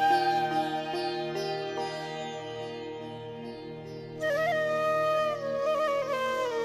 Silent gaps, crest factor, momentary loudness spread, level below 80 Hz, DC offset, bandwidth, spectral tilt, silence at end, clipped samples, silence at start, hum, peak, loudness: none; 16 dB; 14 LU; -68 dBFS; under 0.1%; 13.5 kHz; -4.5 dB/octave; 0 s; under 0.1%; 0 s; none; -14 dBFS; -30 LUFS